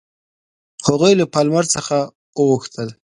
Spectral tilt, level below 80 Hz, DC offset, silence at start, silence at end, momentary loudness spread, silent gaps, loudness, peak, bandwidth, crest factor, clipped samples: -4.5 dB/octave; -56 dBFS; under 0.1%; 0.8 s; 0.25 s; 12 LU; 2.15-2.33 s; -17 LUFS; 0 dBFS; 11.5 kHz; 18 dB; under 0.1%